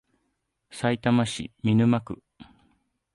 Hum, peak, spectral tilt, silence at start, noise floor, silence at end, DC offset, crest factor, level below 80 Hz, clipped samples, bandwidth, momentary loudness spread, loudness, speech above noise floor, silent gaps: none; -10 dBFS; -6.5 dB/octave; 0.75 s; -76 dBFS; 0.7 s; under 0.1%; 18 dB; -58 dBFS; under 0.1%; 11.5 kHz; 19 LU; -25 LUFS; 53 dB; none